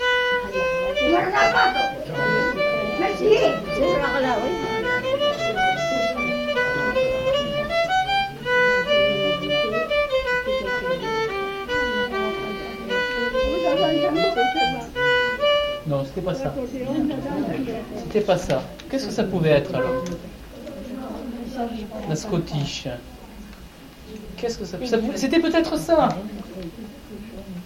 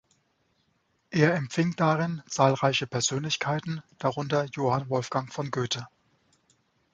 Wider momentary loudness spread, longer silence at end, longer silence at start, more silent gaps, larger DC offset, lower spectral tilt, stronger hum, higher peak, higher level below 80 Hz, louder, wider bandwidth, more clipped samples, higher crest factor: first, 15 LU vs 8 LU; second, 0 s vs 1.05 s; second, 0 s vs 1.1 s; neither; neither; about the same, -5 dB/octave vs -5 dB/octave; neither; about the same, -6 dBFS vs -6 dBFS; first, -44 dBFS vs -66 dBFS; first, -22 LUFS vs -27 LUFS; first, 17 kHz vs 9.4 kHz; neither; about the same, 18 dB vs 22 dB